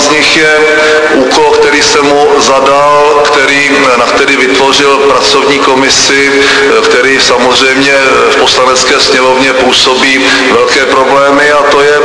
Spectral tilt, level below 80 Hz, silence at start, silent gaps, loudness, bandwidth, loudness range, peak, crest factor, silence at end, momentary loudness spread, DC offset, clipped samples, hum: -2 dB/octave; -38 dBFS; 0 s; none; -4 LUFS; 11 kHz; 0 LU; 0 dBFS; 6 dB; 0 s; 1 LU; under 0.1%; 3%; none